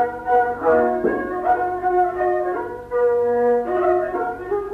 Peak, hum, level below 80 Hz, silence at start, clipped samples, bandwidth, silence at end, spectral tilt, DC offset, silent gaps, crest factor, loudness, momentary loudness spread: -6 dBFS; none; -48 dBFS; 0 s; under 0.1%; 4.3 kHz; 0 s; -8 dB/octave; under 0.1%; none; 14 dB; -20 LUFS; 7 LU